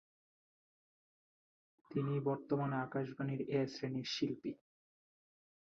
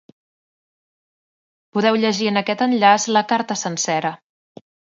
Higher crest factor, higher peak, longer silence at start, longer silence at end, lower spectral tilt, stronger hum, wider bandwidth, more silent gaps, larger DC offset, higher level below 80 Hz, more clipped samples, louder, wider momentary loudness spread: about the same, 18 dB vs 20 dB; second, -24 dBFS vs 0 dBFS; first, 1.9 s vs 1.75 s; first, 1.25 s vs 0.8 s; first, -6 dB/octave vs -3.5 dB/octave; neither; about the same, 7.4 kHz vs 7.8 kHz; neither; neither; second, -80 dBFS vs -72 dBFS; neither; second, -39 LUFS vs -18 LUFS; about the same, 7 LU vs 9 LU